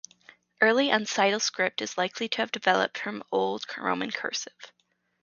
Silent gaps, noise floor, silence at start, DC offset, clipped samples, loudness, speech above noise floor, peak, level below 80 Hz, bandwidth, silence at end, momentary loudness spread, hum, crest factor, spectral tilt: none; -57 dBFS; 0.6 s; under 0.1%; under 0.1%; -27 LUFS; 30 dB; -6 dBFS; -78 dBFS; 7.4 kHz; 0.55 s; 8 LU; none; 22 dB; -2.5 dB/octave